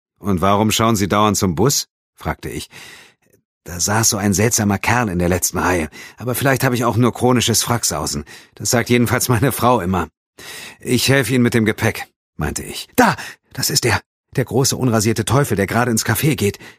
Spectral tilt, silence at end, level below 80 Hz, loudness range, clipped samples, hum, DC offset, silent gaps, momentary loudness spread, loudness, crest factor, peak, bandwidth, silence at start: -4 dB/octave; 0.05 s; -42 dBFS; 2 LU; under 0.1%; none; under 0.1%; 1.91-2.13 s, 3.45-3.61 s, 10.17-10.33 s, 12.16-12.33 s, 14.06-14.24 s; 14 LU; -17 LUFS; 18 dB; 0 dBFS; 15.5 kHz; 0.2 s